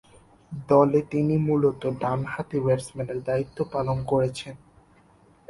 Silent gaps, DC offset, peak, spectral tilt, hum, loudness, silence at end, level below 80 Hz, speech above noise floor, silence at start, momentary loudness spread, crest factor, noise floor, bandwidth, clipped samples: none; under 0.1%; -6 dBFS; -7.5 dB/octave; none; -25 LUFS; 0.95 s; -54 dBFS; 33 dB; 0.5 s; 12 LU; 20 dB; -57 dBFS; 11.5 kHz; under 0.1%